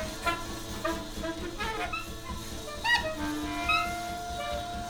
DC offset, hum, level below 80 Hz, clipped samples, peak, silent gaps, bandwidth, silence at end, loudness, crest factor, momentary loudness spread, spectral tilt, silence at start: under 0.1%; none; -44 dBFS; under 0.1%; -14 dBFS; none; over 20 kHz; 0 s; -32 LUFS; 18 dB; 11 LU; -3.5 dB/octave; 0 s